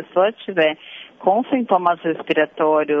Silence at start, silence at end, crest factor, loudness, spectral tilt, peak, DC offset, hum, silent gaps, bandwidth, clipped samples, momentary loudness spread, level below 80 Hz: 0 s; 0 s; 16 dB; -19 LUFS; -7.5 dB/octave; -2 dBFS; under 0.1%; none; none; 5.2 kHz; under 0.1%; 6 LU; -70 dBFS